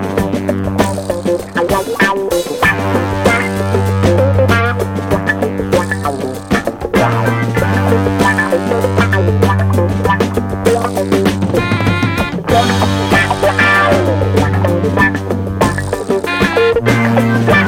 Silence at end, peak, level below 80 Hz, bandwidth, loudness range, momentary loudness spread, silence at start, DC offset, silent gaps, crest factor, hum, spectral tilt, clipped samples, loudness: 0 s; 0 dBFS; -34 dBFS; 16.5 kHz; 2 LU; 5 LU; 0 s; under 0.1%; none; 12 dB; none; -6 dB/octave; under 0.1%; -13 LUFS